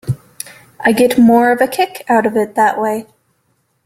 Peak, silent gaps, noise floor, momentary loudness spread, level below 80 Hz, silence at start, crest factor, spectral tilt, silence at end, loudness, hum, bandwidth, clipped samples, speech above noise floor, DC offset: 0 dBFS; none; -63 dBFS; 16 LU; -52 dBFS; 0.05 s; 14 dB; -5.5 dB/octave; 0.8 s; -13 LUFS; none; 16 kHz; under 0.1%; 50 dB; under 0.1%